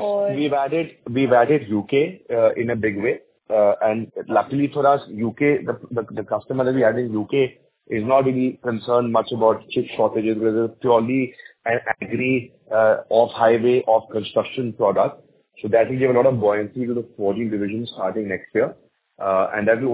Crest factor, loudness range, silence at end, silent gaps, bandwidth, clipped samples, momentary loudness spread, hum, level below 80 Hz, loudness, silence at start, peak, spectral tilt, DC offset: 18 dB; 2 LU; 0 s; none; 4 kHz; under 0.1%; 9 LU; none; -60 dBFS; -21 LUFS; 0 s; -2 dBFS; -10.5 dB/octave; under 0.1%